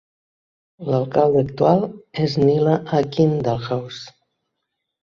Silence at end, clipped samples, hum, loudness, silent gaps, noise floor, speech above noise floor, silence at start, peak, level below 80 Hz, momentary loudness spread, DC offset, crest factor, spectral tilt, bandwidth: 0.95 s; under 0.1%; none; -19 LUFS; none; -78 dBFS; 60 dB; 0.8 s; -2 dBFS; -54 dBFS; 10 LU; under 0.1%; 18 dB; -8 dB/octave; 7.2 kHz